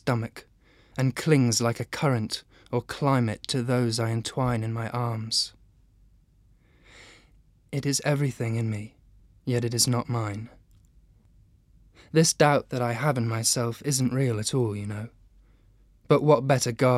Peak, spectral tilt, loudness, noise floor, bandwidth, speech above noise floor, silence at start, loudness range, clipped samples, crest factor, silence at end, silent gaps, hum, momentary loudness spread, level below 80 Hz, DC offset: -6 dBFS; -5 dB/octave; -26 LUFS; -60 dBFS; 15.5 kHz; 35 dB; 0.05 s; 6 LU; under 0.1%; 22 dB; 0 s; none; none; 12 LU; -58 dBFS; under 0.1%